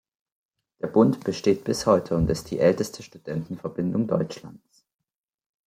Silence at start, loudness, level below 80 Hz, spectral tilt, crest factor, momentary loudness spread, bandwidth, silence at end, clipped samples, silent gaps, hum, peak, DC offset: 0.85 s; -24 LUFS; -48 dBFS; -6.5 dB/octave; 20 dB; 12 LU; 16 kHz; 1.1 s; under 0.1%; none; none; -4 dBFS; under 0.1%